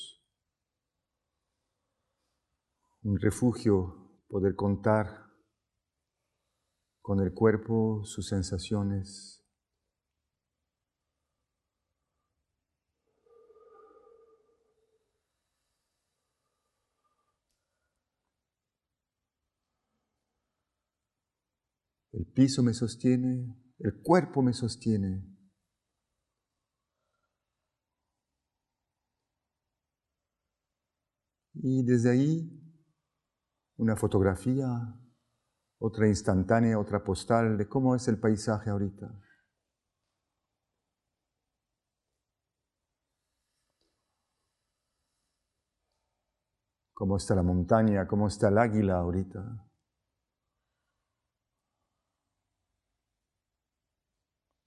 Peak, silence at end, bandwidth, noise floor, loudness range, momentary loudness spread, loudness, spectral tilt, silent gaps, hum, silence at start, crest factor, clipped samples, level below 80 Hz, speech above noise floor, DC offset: -8 dBFS; 5.05 s; 12.5 kHz; -90 dBFS; 10 LU; 14 LU; -29 LUFS; -7 dB/octave; none; none; 0 s; 24 dB; under 0.1%; -52 dBFS; 62 dB; under 0.1%